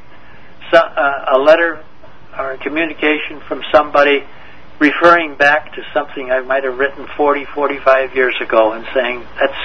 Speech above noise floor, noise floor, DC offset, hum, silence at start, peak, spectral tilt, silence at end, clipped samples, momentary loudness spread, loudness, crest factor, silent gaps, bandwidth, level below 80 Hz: 27 dB; -42 dBFS; 3%; none; 0.6 s; 0 dBFS; -5 dB/octave; 0 s; 0.2%; 10 LU; -14 LUFS; 16 dB; none; 7.4 kHz; -48 dBFS